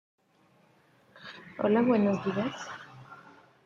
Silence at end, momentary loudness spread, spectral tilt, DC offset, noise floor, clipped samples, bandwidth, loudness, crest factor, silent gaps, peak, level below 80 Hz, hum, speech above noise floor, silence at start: 0.45 s; 25 LU; -7 dB/octave; under 0.1%; -65 dBFS; under 0.1%; 7.4 kHz; -28 LUFS; 20 dB; none; -12 dBFS; -72 dBFS; none; 38 dB; 1.2 s